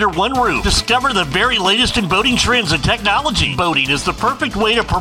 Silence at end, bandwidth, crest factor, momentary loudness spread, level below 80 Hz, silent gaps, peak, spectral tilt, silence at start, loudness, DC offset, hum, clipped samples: 0 s; 16.5 kHz; 14 dB; 3 LU; -30 dBFS; none; -2 dBFS; -3.5 dB/octave; 0 s; -14 LUFS; under 0.1%; none; under 0.1%